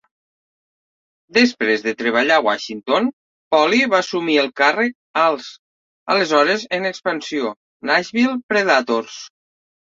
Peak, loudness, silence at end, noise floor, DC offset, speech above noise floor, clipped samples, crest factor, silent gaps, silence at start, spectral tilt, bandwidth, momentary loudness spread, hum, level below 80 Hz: -2 dBFS; -18 LUFS; 0.65 s; under -90 dBFS; under 0.1%; over 72 dB; under 0.1%; 18 dB; 3.13-3.51 s, 4.95-5.14 s, 5.59-6.06 s, 7.56-7.80 s, 8.43-8.49 s; 1.35 s; -3.5 dB/octave; 7.6 kHz; 9 LU; none; -66 dBFS